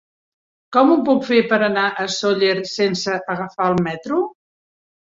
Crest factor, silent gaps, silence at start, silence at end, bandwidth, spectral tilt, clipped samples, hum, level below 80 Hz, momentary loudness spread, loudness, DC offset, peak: 18 dB; none; 0.7 s; 0.85 s; 7.8 kHz; -5 dB/octave; under 0.1%; none; -60 dBFS; 8 LU; -18 LUFS; under 0.1%; -2 dBFS